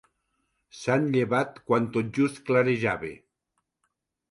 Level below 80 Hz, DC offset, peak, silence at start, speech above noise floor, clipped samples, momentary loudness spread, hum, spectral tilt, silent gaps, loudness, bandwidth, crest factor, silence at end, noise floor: -64 dBFS; under 0.1%; -10 dBFS; 0.75 s; 54 dB; under 0.1%; 8 LU; none; -7 dB/octave; none; -26 LUFS; 11.5 kHz; 18 dB; 1.15 s; -79 dBFS